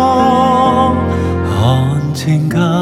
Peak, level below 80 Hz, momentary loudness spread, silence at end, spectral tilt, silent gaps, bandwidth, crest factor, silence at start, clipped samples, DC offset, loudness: 0 dBFS; -32 dBFS; 5 LU; 0 s; -7 dB/octave; none; 14.5 kHz; 12 dB; 0 s; under 0.1%; under 0.1%; -13 LUFS